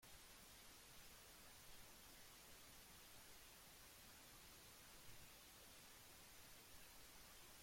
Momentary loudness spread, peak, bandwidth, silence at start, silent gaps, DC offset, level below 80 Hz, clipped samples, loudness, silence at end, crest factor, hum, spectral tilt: 0 LU; -48 dBFS; 16.5 kHz; 0 s; none; under 0.1%; -74 dBFS; under 0.1%; -62 LUFS; 0 s; 16 dB; none; -1.5 dB/octave